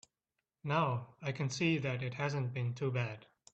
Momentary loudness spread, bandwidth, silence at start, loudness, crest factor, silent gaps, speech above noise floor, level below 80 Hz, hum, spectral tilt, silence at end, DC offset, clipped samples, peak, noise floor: 9 LU; 8.2 kHz; 0.65 s; -36 LUFS; 20 dB; none; 53 dB; -72 dBFS; none; -6 dB/octave; 0.3 s; under 0.1%; under 0.1%; -18 dBFS; -89 dBFS